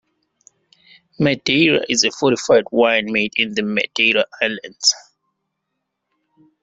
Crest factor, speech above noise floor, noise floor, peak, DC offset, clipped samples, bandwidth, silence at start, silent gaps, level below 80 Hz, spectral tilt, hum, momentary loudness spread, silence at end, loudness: 18 dB; 59 dB; -76 dBFS; -2 dBFS; under 0.1%; under 0.1%; 8.2 kHz; 1.2 s; none; -60 dBFS; -3 dB/octave; none; 6 LU; 1.65 s; -17 LUFS